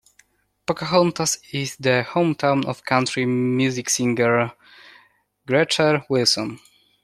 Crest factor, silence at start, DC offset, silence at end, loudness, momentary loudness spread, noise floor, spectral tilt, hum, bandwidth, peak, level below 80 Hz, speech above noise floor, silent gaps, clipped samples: 20 dB; 0.7 s; under 0.1%; 0.45 s; -20 LUFS; 8 LU; -60 dBFS; -4 dB/octave; 50 Hz at -65 dBFS; 14.5 kHz; -2 dBFS; -62 dBFS; 39 dB; none; under 0.1%